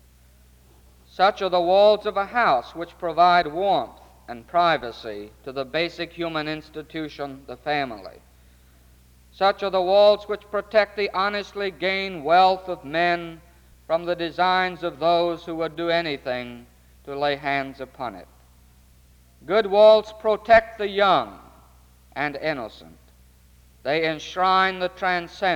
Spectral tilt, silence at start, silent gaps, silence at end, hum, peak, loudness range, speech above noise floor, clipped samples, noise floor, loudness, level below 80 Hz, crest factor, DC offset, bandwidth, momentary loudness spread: -5 dB/octave; 1.2 s; none; 0 s; none; -4 dBFS; 9 LU; 32 dB; under 0.1%; -54 dBFS; -22 LUFS; -54 dBFS; 20 dB; under 0.1%; 16 kHz; 17 LU